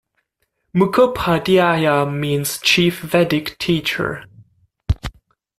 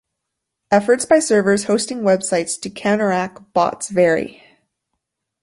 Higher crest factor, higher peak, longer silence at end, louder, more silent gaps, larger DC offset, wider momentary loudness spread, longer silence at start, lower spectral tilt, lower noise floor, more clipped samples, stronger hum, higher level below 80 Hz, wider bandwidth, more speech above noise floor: about the same, 16 dB vs 18 dB; about the same, -2 dBFS vs -2 dBFS; second, 0.5 s vs 1.1 s; about the same, -17 LUFS vs -18 LUFS; neither; neither; first, 11 LU vs 8 LU; about the same, 0.75 s vs 0.7 s; about the same, -5 dB/octave vs -4.5 dB/octave; second, -70 dBFS vs -79 dBFS; neither; neither; first, -38 dBFS vs -60 dBFS; first, 15.5 kHz vs 11.5 kHz; second, 54 dB vs 62 dB